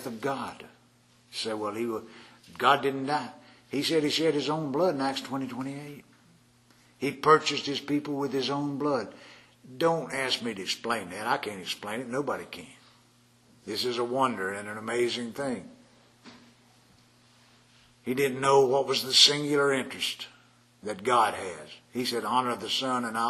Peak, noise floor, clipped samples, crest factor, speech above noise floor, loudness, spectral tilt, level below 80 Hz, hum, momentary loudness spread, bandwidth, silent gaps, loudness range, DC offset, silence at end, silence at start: -4 dBFS; -62 dBFS; under 0.1%; 24 dB; 33 dB; -28 LUFS; -3.5 dB/octave; -72 dBFS; none; 16 LU; 13.5 kHz; none; 9 LU; under 0.1%; 0 s; 0 s